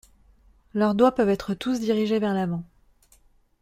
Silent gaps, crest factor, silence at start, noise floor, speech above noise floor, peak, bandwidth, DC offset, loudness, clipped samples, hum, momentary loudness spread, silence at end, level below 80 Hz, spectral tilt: none; 18 dB; 0.75 s; -59 dBFS; 37 dB; -6 dBFS; 15 kHz; under 0.1%; -24 LUFS; under 0.1%; none; 10 LU; 1 s; -56 dBFS; -7 dB/octave